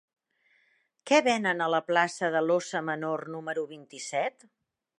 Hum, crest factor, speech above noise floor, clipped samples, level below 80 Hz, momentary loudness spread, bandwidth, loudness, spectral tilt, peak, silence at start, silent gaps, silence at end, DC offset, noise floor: none; 20 dB; 42 dB; under 0.1%; -82 dBFS; 11 LU; 11.5 kHz; -28 LUFS; -4 dB/octave; -8 dBFS; 1.05 s; none; 0.7 s; under 0.1%; -70 dBFS